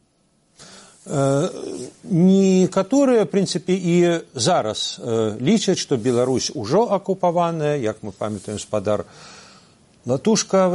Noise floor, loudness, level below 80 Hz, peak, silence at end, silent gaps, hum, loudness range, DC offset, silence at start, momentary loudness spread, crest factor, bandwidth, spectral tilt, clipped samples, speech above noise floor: -62 dBFS; -20 LUFS; -60 dBFS; -6 dBFS; 0 s; none; none; 5 LU; under 0.1%; 0.6 s; 11 LU; 14 dB; 11.5 kHz; -5.5 dB/octave; under 0.1%; 43 dB